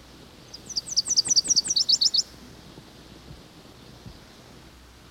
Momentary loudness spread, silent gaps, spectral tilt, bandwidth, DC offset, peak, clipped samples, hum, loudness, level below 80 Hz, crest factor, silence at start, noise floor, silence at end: 19 LU; none; 0.5 dB/octave; 17 kHz; under 0.1%; -10 dBFS; under 0.1%; none; -21 LUFS; -56 dBFS; 18 dB; 0.55 s; -49 dBFS; 1 s